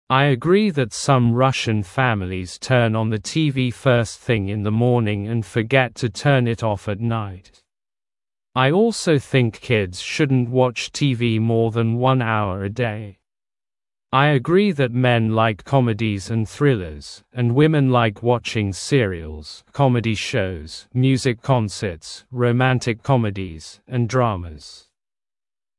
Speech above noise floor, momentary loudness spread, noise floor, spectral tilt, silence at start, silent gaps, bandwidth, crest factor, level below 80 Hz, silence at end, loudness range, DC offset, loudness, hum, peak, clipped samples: over 71 dB; 11 LU; under -90 dBFS; -6 dB/octave; 0.1 s; none; 11.5 kHz; 20 dB; -50 dBFS; 1.05 s; 3 LU; under 0.1%; -20 LUFS; none; 0 dBFS; under 0.1%